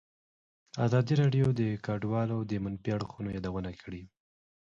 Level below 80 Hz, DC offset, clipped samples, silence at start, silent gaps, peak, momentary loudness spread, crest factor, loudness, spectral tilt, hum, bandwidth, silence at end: -56 dBFS; under 0.1%; under 0.1%; 0.75 s; none; -14 dBFS; 16 LU; 18 dB; -31 LUFS; -8 dB/octave; none; 7.6 kHz; 0.6 s